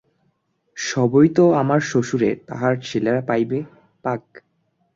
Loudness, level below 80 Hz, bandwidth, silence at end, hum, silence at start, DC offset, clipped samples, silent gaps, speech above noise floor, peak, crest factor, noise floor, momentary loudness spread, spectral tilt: -20 LUFS; -58 dBFS; 7.8 kHz; 0.75 s; none; 0.75 s; under 0.1%; under 0.1%; none; 49 dB; -4 dBFS; 16 dB; -67 dBFS; 14 LU; -6.5 dB/octave